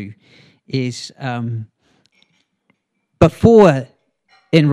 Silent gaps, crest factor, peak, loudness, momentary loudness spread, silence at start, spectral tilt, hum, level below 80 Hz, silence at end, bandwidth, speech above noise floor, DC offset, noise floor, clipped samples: none; 18 dB; 0 dBFS; -15 LUFS; 19 LU; 0 s; -7.5 dB/octave; none; -44 dBFS; 0 s; 11.5 kHz; 51 dB; under 0.1%; -66 dBFS; 0.1%